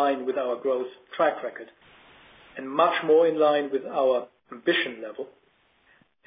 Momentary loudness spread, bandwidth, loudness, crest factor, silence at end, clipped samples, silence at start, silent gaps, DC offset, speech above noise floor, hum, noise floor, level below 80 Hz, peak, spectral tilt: 19 LU; 5 kHz; -25 LUFS; 18 dB; 1 s; under 0.1%; 0 s; none; under 0.1%; 39 dB; none; -64 dBFS; -74 dBFS; -8 dBFS; -8 dB/octave